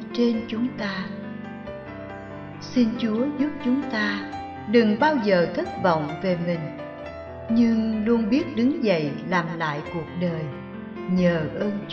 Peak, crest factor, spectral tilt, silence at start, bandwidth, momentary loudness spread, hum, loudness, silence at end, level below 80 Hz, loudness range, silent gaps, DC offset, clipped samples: -4 dBFS; 20 dB; -7.5 dB/octave; 0 s; 6.6 kHz; 16 LU; none; -24 LUFS; 0 s; -54 dBFS; 4 LU; none; under 0.1%; under 0.1%